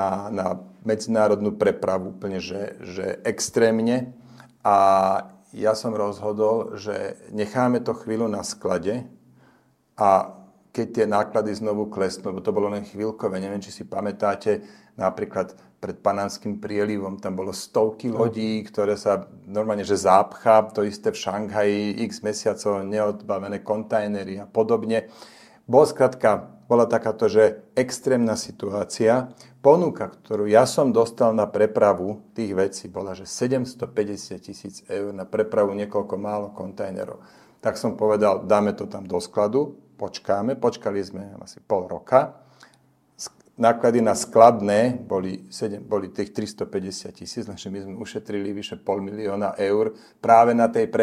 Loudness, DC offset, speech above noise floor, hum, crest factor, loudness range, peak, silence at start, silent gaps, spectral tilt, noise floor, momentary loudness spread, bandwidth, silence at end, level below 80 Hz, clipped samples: -23 LUFS; under 0.1%; 38 dB; none; 22 dB; 7 LU; 0 dBFS; 0 s; none; -5.5 dB/octave; -60 dBFS; 14 LU; 15 kHz; 0 s; -66 dBFS; under 0.1%